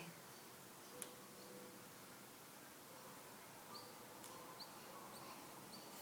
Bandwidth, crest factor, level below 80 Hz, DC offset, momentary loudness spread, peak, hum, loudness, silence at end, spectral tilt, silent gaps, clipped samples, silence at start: 19 kHz; 30 dB; -90 dBFS; under 0.1%; 4 LU; -28 dBFS; none; -56 LUFS; 0 s; -2.5 dB/octave; none; under 0.1%; 0 s